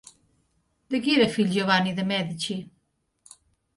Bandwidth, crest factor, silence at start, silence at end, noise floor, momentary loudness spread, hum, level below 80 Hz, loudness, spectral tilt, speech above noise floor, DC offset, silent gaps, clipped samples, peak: 11.5 kHz; 20 dB; 0.9 s; 1.15 s; -73 dBFS; 10 LU; none; -64 dBFS; -24 LUFS; -5 dB/octave; 49 dB; under 0.1%; none; under 0.1%; -8 dBFS